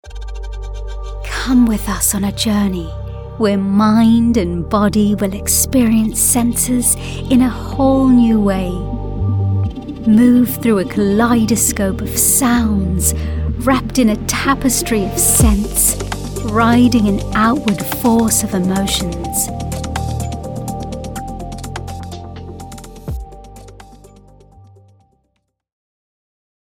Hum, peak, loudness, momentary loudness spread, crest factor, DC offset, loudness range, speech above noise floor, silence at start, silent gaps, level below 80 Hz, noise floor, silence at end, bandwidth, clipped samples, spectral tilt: none; 0 dBFS; -14 LUFS; 17 LU; 14 dB; under 0.1%; 14 LU; 54 dB; 0.05 s; none; -28 dBFS; -68 dBFS; 2.7 s; 19.5 kHz; under 0.1%; -4.5 dB/octave